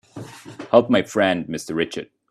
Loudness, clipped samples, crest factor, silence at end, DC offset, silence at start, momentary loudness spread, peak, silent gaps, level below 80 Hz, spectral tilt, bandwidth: -20 LUFS; under 0.1%; 22 dB; 0.25 s; under 0.1%; 0.15 s; 22 LU; 0 dBFS; none; -60 dBFS; -5 dB/octave; 13.5 kHz